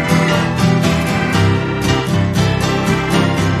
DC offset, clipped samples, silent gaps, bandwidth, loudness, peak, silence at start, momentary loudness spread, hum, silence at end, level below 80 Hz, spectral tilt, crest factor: under 0.1%; under 0.1%; none; 14 kHz; -15 LUFS; -2 dBFS; 0 s; 2 LU; none; 0 s; -32 dBFS; -5.5 dB/octave; 12 dB